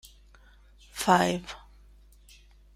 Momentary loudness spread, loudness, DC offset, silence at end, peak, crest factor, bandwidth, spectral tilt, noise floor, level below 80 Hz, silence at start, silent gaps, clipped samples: 21 LU; -26 LUFS; under 0.1%; 1.2 s; -6 dBFS; 26 dB; 16 kHz; -4.5 dB/octave; -55 dBFS; -54 dBFS; 0.95 s; none; under 0.1%